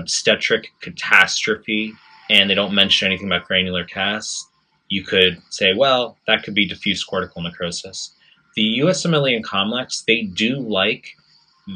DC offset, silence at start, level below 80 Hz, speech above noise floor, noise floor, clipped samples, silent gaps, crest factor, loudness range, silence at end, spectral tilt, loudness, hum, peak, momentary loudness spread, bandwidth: under 0.1%; 0 s; -62 dBFS; 23 dB; -42 dBFS; under 0.1%; none; 20 dB; 4 LU; 0 s; -3 dB/octave; -18 LUFS; none; 0 dBFS; 14 LU; 11 kHz